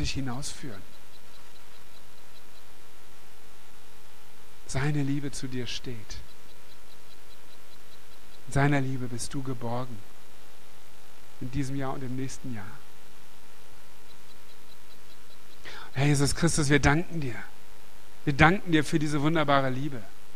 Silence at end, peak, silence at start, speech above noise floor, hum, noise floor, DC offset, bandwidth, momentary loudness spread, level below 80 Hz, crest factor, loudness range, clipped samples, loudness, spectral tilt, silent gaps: 0.25 s; -2 dBFS; 0 s; 26 dB; 50 Hz at -60 dBFS; -54 dBFS; 4%; 15.5 kHz; 24 LU; -46 dBFS; 30 dB; 17 LU; under 0.1%; -28 LUFS; -5 dB/octave; none